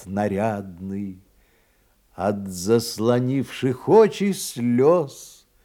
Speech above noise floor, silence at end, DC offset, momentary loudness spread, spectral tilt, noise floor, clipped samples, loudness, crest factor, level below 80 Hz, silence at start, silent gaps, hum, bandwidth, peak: 40 dB; 0.35 s; under 0.1%; 15 LU; -6 dB/octave; -61 dBFS; under 0.1%; -22 LUFS; 18 dB; -62 dBFS; 0 s; none; none; 17.5 kHz; -4 dBFS